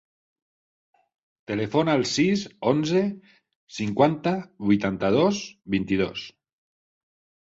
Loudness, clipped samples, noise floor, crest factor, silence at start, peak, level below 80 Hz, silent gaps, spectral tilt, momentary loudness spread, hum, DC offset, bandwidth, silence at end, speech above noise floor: -24 LUFS; under 0.1%; under -90 dBFS; 20 dB; 1.5 s; -6 dBFS; -58 dBFS; 3.56-3.67 s; -5.5 dB/octave; 10 LU; none; under 0.1%; 8 kHz; 1.2 s; over 66 dB